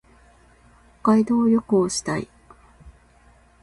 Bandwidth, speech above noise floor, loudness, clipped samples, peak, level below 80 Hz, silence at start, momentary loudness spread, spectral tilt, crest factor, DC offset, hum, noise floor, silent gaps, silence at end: 11.5 kHz; 35 dB; -21 LUFS; under 0.1%; -8 dBFS; -54 dBFS; 1.05 s; 11 LU; -5.5 dB/octave; 16 dB; under 0.1%; none; -54 dBFS; none; 0.75 s